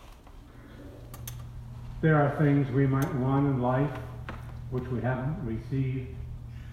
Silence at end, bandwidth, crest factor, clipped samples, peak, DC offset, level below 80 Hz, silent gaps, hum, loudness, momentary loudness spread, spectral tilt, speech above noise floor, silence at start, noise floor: 0 s; 15.5 kHz; 18 dB; under 0.1%; -12 dBFS; under 0.1%; -46 dBFS; none; none; -28 LUFS; 19 LU; -8.5 dB/octave; 22 dB; 0 s; -49 dBFS